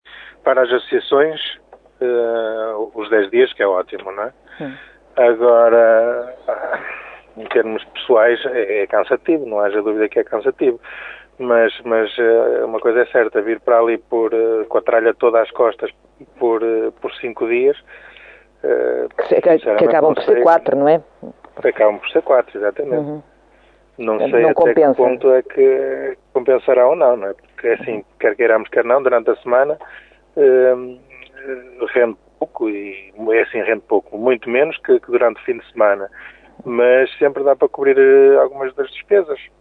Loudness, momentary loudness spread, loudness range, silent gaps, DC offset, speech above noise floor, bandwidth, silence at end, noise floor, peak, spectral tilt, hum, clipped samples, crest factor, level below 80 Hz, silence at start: -16 LUFS; 14 LU; 5 LU; none; under 0.1%; 36 dB; 4.5 kHz; 0.15 s; -51 dBFS; 0 dBFS; -7.5 dB/octave; none; under 0.1%; 16 dB; -60 dBFS; 0.15 s